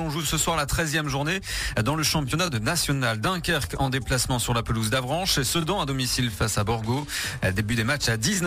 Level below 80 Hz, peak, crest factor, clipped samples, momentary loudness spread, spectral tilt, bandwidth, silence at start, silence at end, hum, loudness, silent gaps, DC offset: -40 dBFS; -10 dBFS; 16 dB; under 0.1%; 4 LU; -3.5 dB/octave; 15.5 kHz; 0 s; 0 s; none; -24 LUFS; none; under 0.1%